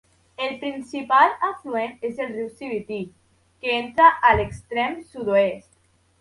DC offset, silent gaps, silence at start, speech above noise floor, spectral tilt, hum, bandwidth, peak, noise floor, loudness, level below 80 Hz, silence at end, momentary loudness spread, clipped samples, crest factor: under 0.1%; none; 0.4 s; 40 dB; -5.5 dB/octave; none; 11.5 kHz; -2 dBFS; -62 dBFS; -22 LUFS; -48 dBFS; 0.6 s; 15 LU; under 0.1%; 20 dB